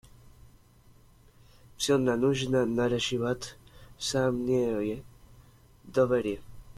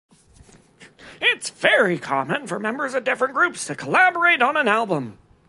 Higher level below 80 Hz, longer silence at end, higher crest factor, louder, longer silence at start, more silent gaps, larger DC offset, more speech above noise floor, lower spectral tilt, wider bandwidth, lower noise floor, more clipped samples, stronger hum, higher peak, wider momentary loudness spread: first, -54 dBFS vs -64 dBFS; second, 0.05 s vs 0.35 s; about the same, 16 dB vs 20 dB; second, -28 LUFS vs -20 LUFS; first, 1.8 s vs 0.8 s; neither; neither; about the same, 30 dB vs 30 dB; first, -5 dB/octave vs -3.5 dB/octave; first, 15.5 kHz vs 11.5 kHz; first, -58 dBFS vs -51 dBFS; neither; neither; second, -14 dBFS vs -2 dBFS; about the same, 9 LU vs 9 LU